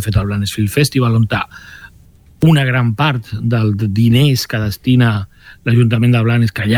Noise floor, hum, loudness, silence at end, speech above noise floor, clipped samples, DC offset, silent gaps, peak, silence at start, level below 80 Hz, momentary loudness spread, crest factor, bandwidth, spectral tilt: -44 dBFS; none; -14 LUFS; 0 s; 31 dB; under 0.1%; under 0.1%; none; -2 dBFS; 0 s; -38 dBFS; 8 LU; 12 dB; 15.5 kHz; -6.5 dB/octave